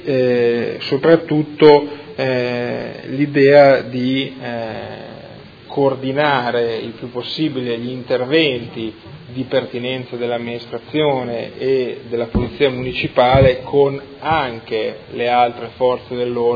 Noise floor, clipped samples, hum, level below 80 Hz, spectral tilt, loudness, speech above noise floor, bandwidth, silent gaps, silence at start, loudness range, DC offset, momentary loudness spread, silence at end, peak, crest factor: -38 dBFS; under 0.1%; none; -42 dBFS; -8 dB/octave; -17 LUFS; 21 dB; 5 kHz; none; 0 s; 6 LU; under 0.1%; 15 LU; 0 s; 0 dBFS; 16 dB